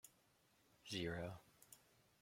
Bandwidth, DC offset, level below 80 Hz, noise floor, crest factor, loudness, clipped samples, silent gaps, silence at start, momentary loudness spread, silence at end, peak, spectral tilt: 16.5 kHz; under 0.1%; -74 dBFS; -77 dBFS; 20 dB; -48 LUFS; under 0.1%; none; 0.05 s; 20 LU; 0.45 s; -32 dBFS; -4.5 dB/octave